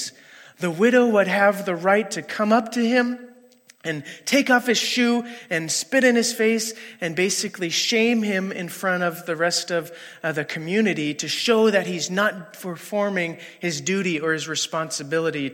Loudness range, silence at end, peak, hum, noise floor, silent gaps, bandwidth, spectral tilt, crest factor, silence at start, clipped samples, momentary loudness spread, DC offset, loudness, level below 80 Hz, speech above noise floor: 3 LU; 0 s; -4 dBFS; none; -53 dBFS; none; 16.5 kHz; -3.5 dB/octave; 18 dB; 0 s; under 0.1%; 11 LU; under 0.1%; -22 LUFS; -78 dBFS; 31 dB